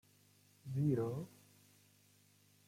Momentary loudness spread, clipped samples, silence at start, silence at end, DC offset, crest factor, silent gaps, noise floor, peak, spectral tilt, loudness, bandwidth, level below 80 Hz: 18 LU; under 0.1%; 0.65 s; 1.4 s; under 0.1%; 18 dB; none; -70 dBFS; -24 dBFS; -9 dB/octave; -39 LUFS; 16 kHz; -74 dBFS